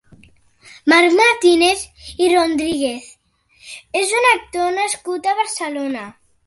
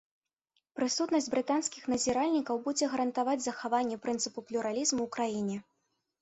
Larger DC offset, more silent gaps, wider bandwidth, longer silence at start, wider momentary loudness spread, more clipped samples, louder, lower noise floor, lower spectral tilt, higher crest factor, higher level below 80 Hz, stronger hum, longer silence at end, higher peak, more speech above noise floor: neither; neither; first, 11.5 kHz vs 8.4 kHz; about the same, 0.85 s vs 0.75 s; first, 17 LU vs 6 LU; neither; first, -16 LUFS vs -32 LUFS; second, -55 dBFS vs -80 dBFS; about the same, -2 dB/octave vs -3 dB/octave; about the same, 16 dB vs 16 dB; first, -52 dBFS vs -70 dBFS; neither; second, 0.35 s vs 0.6 s; first, -2 dBFS vs -16 dBFS; second, 39 dB vs 49 dB